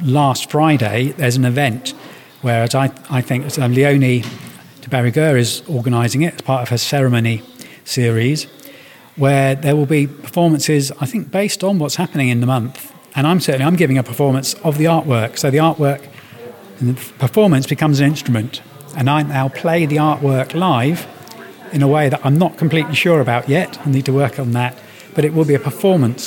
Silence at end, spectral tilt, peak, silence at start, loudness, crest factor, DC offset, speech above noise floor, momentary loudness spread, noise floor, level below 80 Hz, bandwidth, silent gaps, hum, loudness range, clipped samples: 0 s; -6 dB/octave; 0 dBFS; 0 s; -16 LUFS; 16 dB; under 0.1%; 25 dB; 11 LU; -40 dBFS; -58 dBFS; 17.5 kHz; none; none; 2 LU; under 0.1%